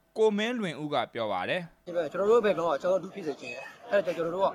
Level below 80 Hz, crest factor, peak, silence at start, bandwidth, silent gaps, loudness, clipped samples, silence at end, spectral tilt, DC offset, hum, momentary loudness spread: -72 dBFS; 16 dB; -12 dBFS; 0.15 s; 13 kHz; none; -29 LUFS; under 0.1%; 0 s; -5.5 dB/octave; under 0.1%; none; 12 LU